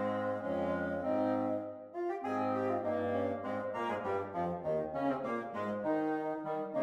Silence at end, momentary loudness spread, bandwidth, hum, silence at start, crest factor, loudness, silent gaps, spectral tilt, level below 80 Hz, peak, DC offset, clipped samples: 0 s; 4 LU; 11 kHz; none; 0 s; 14 dB; -36 LUFS; none; -8 dB/octave; -70 dBFS; -22 dBFS; under 0.1%; under 0.1%